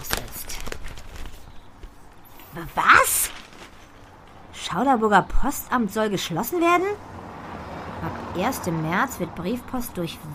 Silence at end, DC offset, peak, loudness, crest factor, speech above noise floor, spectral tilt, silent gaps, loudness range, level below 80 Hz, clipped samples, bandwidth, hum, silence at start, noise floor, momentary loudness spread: 0 s; under 0.1%; 0 dBFS; -23 LUFS; 24 dB; 25 dB; -3.5 dB/octave; none; 4 LU; -38 dBFS; under 0.1%; 15.5 kHz; none; 0 s; -46 dBFS; 22 LU